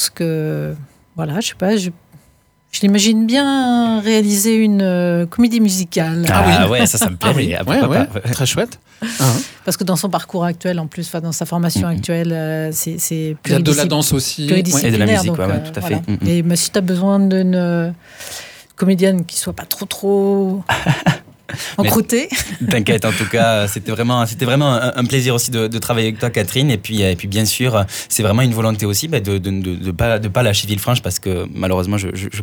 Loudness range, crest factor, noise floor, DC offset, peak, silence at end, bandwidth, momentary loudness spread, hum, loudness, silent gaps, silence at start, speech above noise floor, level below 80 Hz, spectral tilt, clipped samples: 4 LU; 14 dB; -54 dBFS; under 0.1%; -2 dBFS; 0 s; over 20 kHz; 8 LU; none; -16 LUFS; none; 0 s; 38 dB; -44 dBFS; -4.5 dB/octave; under 0.1%